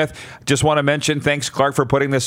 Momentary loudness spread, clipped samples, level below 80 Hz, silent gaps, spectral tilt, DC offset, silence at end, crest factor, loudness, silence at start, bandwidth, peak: 5 LU; under 0.1%; -46 dBFS; none; -4.5 dB/octave; under 0.1%; 0 s; 18 dB; -18 LUFS; 0 s; 16 kHz; -2 dBFS